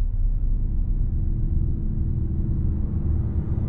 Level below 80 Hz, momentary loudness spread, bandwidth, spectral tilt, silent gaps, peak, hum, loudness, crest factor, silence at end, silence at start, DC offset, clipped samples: -24 dBFS; 2 LU; 1.5 kHz; -13.5 dB/octave; none; -12 dBFS; none; -27 LUFS; 10 dB; 0 s; 0 s; 2%; under 0.1%